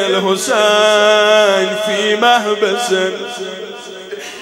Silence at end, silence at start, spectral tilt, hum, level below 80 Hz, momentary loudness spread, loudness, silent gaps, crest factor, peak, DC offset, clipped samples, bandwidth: 0 s; 0 s; -2.5 dB/octave; none; -66 dBFS; 18 LU; -12 LUFS; none; 14 dB; 0 dBFS; under 0.1%; under 0.1%; 16.5 kHz